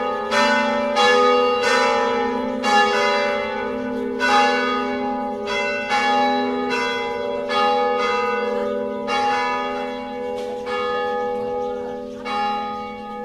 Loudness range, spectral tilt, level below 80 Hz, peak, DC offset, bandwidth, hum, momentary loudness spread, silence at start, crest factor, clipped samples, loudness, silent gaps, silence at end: 6 LU; -3 dB/octave; -54 dBFS; -4 dBFS; under 0.1%; 13 kHz; none; 10 LU; 0 s; 16 dB; under 0.1%; -20 LUFS; none; 0 s